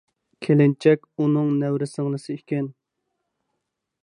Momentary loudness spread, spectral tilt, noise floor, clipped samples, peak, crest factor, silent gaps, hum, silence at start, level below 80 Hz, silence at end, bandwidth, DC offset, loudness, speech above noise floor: 12 LU; -8.5 dB/octave; -79 dBFS; under 0.1%; -4 dBFS; 18 dB; none; none; 0.4 s; -74 dBFS; 1.3 s; 10.5 kHz; under 0.1%; -22 LUFS; 58 dB